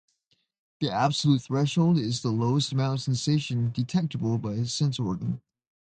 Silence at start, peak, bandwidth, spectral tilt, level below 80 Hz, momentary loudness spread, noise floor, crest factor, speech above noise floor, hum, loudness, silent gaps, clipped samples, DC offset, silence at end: 0.8 s; -10 dBFS; 9.2 kHz; -6 dB/octave; -60 dBFS; 6 LU; -73 dBFS; 16 dB; 47 dB; none; -26 LUFS; none; under 0.1%; under 0.1%; 0.5 s